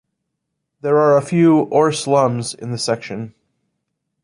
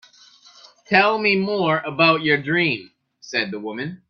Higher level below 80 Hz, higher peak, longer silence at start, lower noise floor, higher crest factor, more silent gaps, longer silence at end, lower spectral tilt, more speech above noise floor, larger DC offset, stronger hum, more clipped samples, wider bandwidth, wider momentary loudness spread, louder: about the same, -62 dBFS vs -64 dBFS; about the same, -2 dBFS vs 0 dBFS; about the same, 0.85 s vs 0.9 s; first, -76 dBFS vs -50 dBFS; second, 16 dB vs 22 dB; neither; first, 0.95 s vs 0.15 s; about the same, -6 dB/octave vs -5.5 dB/octave; first, 60 dB vs 31 dB; neither; neither; neither; first, 11.5 kHz vs 7 kHz; first, 14 LU vs 11 LU; first, -16 LUFS vs -19 LUFS